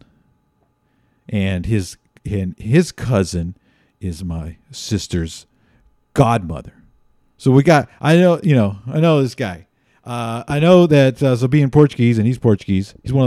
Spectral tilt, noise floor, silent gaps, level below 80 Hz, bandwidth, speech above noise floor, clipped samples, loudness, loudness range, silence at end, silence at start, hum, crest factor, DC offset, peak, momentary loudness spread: -7 dB/octave; -63 dBFS; none; -42 dBFS; 13.5 kHz; 47 dB; under 0.1%; -16 LUFS; 8 LU; 0 s; 1.3 s; none; 16 dB; under 0.1%; 0 dBFS; 17 LU